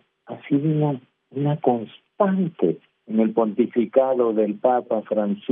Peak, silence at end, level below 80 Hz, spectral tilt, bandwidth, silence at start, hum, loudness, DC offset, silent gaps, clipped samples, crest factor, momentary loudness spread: -4 dBFS; 0 s; -80 dBFS; -8 dB/octave; 3.8 kHz; 0.3 s; none; -22 LUFS; under 0.1%; none; under 0.1%; 18 dB; 13 LU